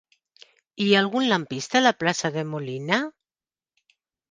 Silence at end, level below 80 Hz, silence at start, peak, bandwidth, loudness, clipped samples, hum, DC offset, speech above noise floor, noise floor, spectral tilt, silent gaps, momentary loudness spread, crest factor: 1.2 s; -70 dBFS; 0.8 s; -2 dBFS; 9.8 kHz; -23 LUFS; under 0.1%; none; under 0.1%; over 67 dB; under -90 dBFS; -4 dB/octave; none; 10 LU; 22 dB